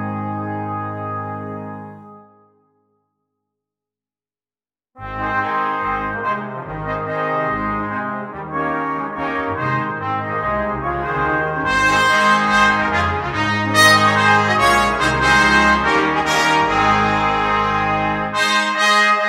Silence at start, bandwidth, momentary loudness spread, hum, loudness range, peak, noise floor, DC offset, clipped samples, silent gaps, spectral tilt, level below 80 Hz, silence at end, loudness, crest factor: 0 s; 16 kHz; 13 LU; none; 15 LU; 0 dBFS; under -90 dBFS; under 0.1%; under 0.1%; none; -4 dB/octave; -40 dBFS; 0 s; -17 LUFS; 18 dB